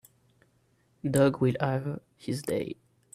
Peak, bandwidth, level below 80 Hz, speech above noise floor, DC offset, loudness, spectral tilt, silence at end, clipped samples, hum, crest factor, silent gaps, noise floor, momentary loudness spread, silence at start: -10 dBFS; 15.5 kHz; -62 dBFS; 40 dB; under 0.1%; -29 LUFS; -6.5 dB/octave; 0.4 s; under 0.1%; none; 20 dB; none; -68 dBFS; 15 LU; 1.05 s